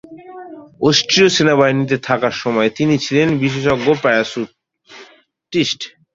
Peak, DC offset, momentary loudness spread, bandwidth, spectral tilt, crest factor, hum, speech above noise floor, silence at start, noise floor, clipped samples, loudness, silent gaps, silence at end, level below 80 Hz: 0 dBFS; under 0.1%; 15 LU; 7.8 kHz; -4.5 dB/octave; 16 dB; none; 33 dB; 0.1 s; -48 dBFS; under 0.1%; -15 LUFS; none; 0.25 s; -52 dBFS